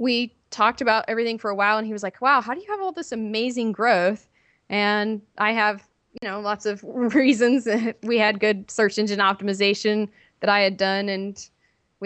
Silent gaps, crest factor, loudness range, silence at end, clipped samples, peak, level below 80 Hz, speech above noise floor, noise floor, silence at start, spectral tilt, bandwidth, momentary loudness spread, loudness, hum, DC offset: none; 18 dB; 3 LU; 0 s; under 0.1%; -4 dBFS; -68 dBFS; 33 dB; -55 dBFS; 0 s; -4.5 dB/octave; 8.8 kHz; 10 LU; -22 LUFS; none; under 0.1%